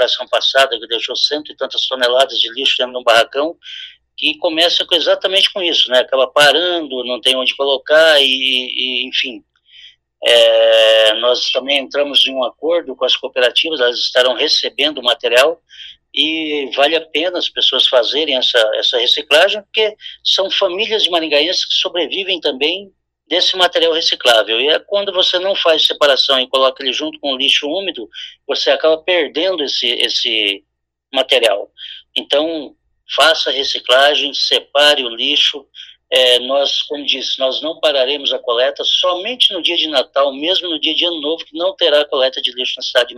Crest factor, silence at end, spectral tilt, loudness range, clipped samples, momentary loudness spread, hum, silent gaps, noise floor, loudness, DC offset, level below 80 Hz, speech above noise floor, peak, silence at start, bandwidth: 16 dB; 0 s; -0.5 dB/octave; 3 LU; under 0.1%; 8 LU; none; none; -43 dBFS; -13 LUFS; under 0.1%; -64 dBFS; 28 dB; 0 dBFS; 0 s; 15.5 kHz